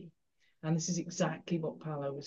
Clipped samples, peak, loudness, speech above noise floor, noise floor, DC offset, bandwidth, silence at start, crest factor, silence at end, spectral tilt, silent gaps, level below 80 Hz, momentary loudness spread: under 0.1%; -18 dBFS; -36 LUFS; 41 dB; -76 dBFS; under 0.1%; 8 kHz; 0 s; 18 dB; 0 s; -5.5 dB/octave; none; -80 dBFS; 6 LU